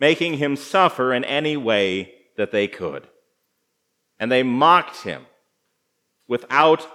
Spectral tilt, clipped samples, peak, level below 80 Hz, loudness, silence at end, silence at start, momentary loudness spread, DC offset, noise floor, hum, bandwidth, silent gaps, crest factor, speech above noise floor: -5 dB/octave; under 0.1%; 0 dBFS; -72 dBFS; -20 LUFS; 0 s; 0 s; 15 LU; under 0.1%; -73 dBFS; none; 14 kHz; none; 20 dB; 54 dB